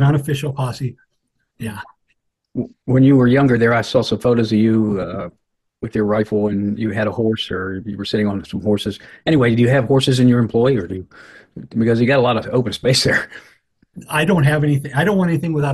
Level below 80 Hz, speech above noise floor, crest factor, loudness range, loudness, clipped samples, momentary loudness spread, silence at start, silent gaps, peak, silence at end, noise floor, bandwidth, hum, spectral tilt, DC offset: -48 dBFS; 54 dB; 14 dB; 5 LU; -17 LUFS; under 0.1%; 14 LU; 0 s; none; -2 dBFS; 0 s; -71 dBFS; 12.5 kHz; none; -6.5 dB/octave; under 0.1%